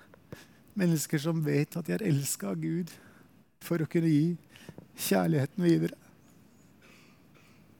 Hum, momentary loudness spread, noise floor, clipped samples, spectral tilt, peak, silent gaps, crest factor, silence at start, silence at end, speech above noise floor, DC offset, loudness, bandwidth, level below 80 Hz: none; 23 LU; -59 dBFS; under 0.1%; -6 dB/octave; -14 dBFS; none; 18 dB; 0.3 s; 1.85 s; 31 dB; under 0.1%; -30 LUFS; 18 kHz; -72 dBFS